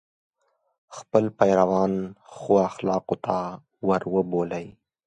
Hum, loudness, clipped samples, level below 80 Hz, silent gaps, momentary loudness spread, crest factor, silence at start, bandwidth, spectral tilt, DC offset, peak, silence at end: none; -24 LUFS; under 0.1%; -60 dBFS; none; 17 LU; 22 dB; 0.9 s; 9 kHz; -7.5 dB/octave; under 0.1%; -4 dBFS; 0.35 s